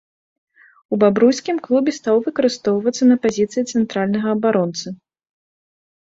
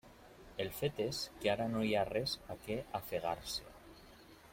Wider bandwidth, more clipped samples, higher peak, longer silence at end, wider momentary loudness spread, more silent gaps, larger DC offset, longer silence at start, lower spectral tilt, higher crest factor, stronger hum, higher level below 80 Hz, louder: second, 7.8 kHz vs 16.5 kHz; neither; first, -2 dBFS vs -20 dBFS; first, 1.1 s vs 0 s; second, 8 LU vs 23 LU; neither; neither; first, 0.9 s vs 0.05 s; about the same, -5.5 dB/octave vs -4.5 dB/octave; about the same, 16 dB vs 20 dB; neither; about the same, -62 dBFS vs -62 dBFS; first, -18 LUFS vs -38 LUFS